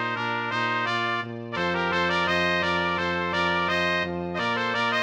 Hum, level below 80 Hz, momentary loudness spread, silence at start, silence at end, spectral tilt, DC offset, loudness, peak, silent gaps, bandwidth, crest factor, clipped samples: none; -56 dBFS; 5 LU; 0 s; 0 s; -5 dB/octave; under 0.1%; -25 LUFS; -10 dBFS; none; 9.4 kHz; 14 dB; under 0.1%